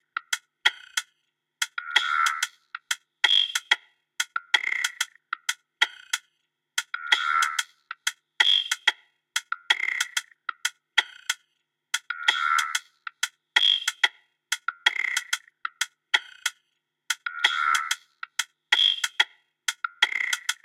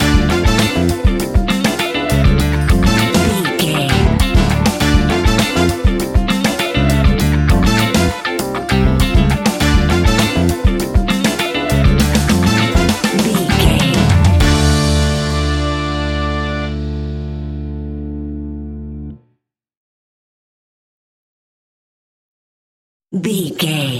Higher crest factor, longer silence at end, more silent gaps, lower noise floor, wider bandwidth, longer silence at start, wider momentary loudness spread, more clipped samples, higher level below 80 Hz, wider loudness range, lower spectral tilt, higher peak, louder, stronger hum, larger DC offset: first, 24 dB vs 14 dB; about the same, 0.1 s vs 0 s; second, none vs 19.77-23.00 s; first, -77 dBFS vs -66 dBFS; about the same, 16.5 kHz vs 17 kHz; first, 0.15 s vs 0 s; about the same, 12 LU vs 12 LU; neither; second, under -90 dBFS vs -20 dBFS; second, 3 LU vs 14 LU; second, 5.5 dB/octave vs -5 dB/octave; second, -4 dBFS vs 0 dBFS; second, -25 LUFS vs -14 LUFS; neither; neither